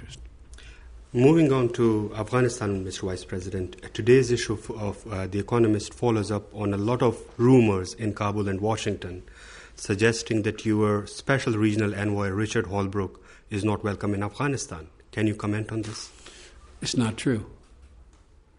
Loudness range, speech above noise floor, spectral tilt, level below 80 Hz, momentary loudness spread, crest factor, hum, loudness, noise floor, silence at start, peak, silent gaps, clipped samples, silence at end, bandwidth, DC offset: 6 LU; 30 dB; -6 dB/octave; -50 dBFS; 15 LU; 18 dB; none; -26 LUFS; -55 dBFS; 0 s; -6 dBFS; none; under 0.1%; 0.55 s; 10.5 kHz; under 0.1%